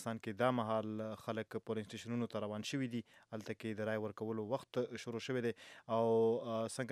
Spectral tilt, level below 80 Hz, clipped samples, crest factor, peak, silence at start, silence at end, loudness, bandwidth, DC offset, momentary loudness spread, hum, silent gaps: -6 dB/octave; -84 dBFS; under 0.1%; 20 dB; -18 dBFS; 0 s; 0 s; -40 LUFS; 14.5 kHz; under 0.1%; 10 LU; none; none